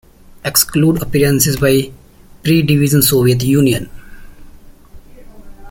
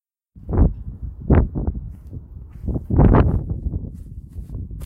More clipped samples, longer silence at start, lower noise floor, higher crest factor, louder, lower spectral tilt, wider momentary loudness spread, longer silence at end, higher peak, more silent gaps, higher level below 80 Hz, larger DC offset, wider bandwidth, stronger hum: neither; about the same, 0.45 s vs 0.35 s; about the same, -38 dBFS vs -41 dBFS; about the same, 16 dB vs 18 dB; first, -13 LUFS vs -20 LUFS; second, -5 dB/octave vs -11 dB/octave; second, 11 LU vs 22 LU; about the same, 0 s vs 0 s; first, 0 dBFS vs -4 dBFS; neither; second, -38 dBFS vs -24 dBFS; neither; first, 17 kHz vs 3.3 kHz; neither